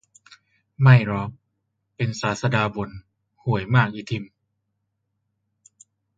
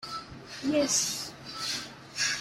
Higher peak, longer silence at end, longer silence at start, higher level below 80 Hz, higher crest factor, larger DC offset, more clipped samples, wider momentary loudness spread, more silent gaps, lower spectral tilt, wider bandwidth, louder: first, -2 dBFS vs -14 dBFS; first, 1.9 s vs 0 s; first, 0.8 s vs 0 s; first, -54 dBFS vs -62 dBFS; about the same, 22 dB vs 18 dB; neither; neither; first, 17 LU vs 14 LU; neither; first, -7 dB/octave vs -1.5 dB/octave; second, 7.8 kHz vs 16 kHz; first, -22 LUFS vs -30 LUFS